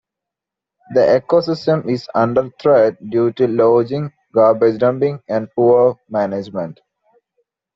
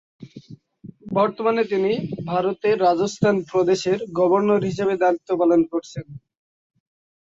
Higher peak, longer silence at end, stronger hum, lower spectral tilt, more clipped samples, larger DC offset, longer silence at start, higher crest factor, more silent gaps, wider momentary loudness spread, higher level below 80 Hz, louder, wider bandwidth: first, -2 dBFS vs -6 dBFS; second, 1.05 s vs 1.2 s; neither; about the same, -6.5 dB/octave vs -6.5 dB/octave; neither; neither; first, 0.9 s vs 0.2 s; about the same, 14 dB vs 16 dB; neither; about the same, 9 LU vs 8 LU; about the same, -58 dBFS vs -60 dBFS; first, -16 LUFS vs -21 LUFS; about the same, 7.2 kHz vs 7.8 kHz